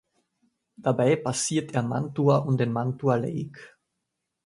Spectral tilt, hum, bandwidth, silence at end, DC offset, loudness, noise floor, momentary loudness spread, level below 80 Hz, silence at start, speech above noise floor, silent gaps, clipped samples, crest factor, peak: -6 dB/octave; none; 11.5 kHz; 0.8 s; under 0.1%; -25 LUFS; -82 dBFS; 8 LU; -64 dBFS; 0.8 s; 57 dB; none; under 0.1%; 18 dB; -8 dBFS